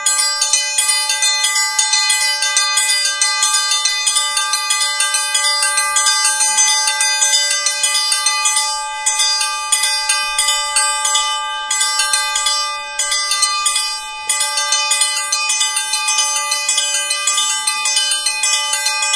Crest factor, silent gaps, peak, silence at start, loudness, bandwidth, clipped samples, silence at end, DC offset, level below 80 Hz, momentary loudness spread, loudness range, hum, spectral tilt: 16 dB; none; 0 dBFS; 0 s; -13 LUFS; 11 kHz; under 0.1%; 0 s; under 0.1%; -56 dBFS; 4 LU; 3 LU; none; 5.5 dB/octave